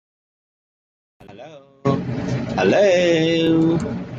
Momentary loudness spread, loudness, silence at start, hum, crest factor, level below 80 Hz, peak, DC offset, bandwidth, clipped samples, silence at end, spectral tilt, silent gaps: 10 LU; -18 LUFS; 1.3 s; none; 16 dB; -50 dBFS; -4 dBFS; under 0.1%; 8 kHz; under 0.1%; 0 s; -6.5 dB/octave; none